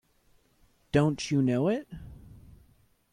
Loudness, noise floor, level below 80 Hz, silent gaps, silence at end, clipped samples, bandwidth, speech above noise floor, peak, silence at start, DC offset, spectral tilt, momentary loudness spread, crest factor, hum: -28 LUFS; -66 dBFS; -54 dBFS; none; 0.75 s; under 0.1%; 11 kHz; 39 dB; -10 dBFS; 0.95 s; under 0.1%; -6.5 dB/octave; 20 LU; 20 dB; none